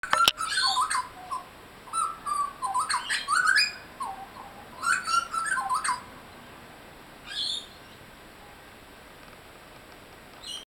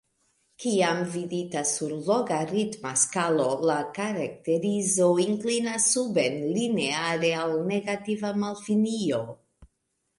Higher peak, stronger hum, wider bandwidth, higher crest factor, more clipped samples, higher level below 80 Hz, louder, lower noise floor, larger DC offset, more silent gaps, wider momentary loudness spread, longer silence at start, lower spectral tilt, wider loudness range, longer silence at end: first, -2 dBFS vs -10 dBFS; neither; first, 19 kHz vs 11.5 kHz; first, 30 dB vs 16 dB; neither; first, -60 dBFS vs -68 dBFS; about the same, -27 LUFS vs -26 LUFS; second, -49 dBFS vs -77 dBFS; neither; neither; first, 25 LU vs 8 LU; second, 0.05 s vs 0.6 s; second, 0.5 dB/octave vs -4 dB/octave; first, 11 LU vs 3 LU; second, 0.1 s vs 0.55 s